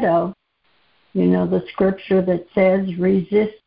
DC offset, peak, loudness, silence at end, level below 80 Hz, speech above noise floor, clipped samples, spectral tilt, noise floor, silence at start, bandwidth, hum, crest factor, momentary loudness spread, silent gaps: under 0.1%; -4 dBFS; -19 LUFS; 0.1 s; -50 dBFS; 45 dB; under 0.1%; -12.5 dB/octave; -63 dBFS; 0 s; 5 kHz; none; 14 dB; 4 LU; none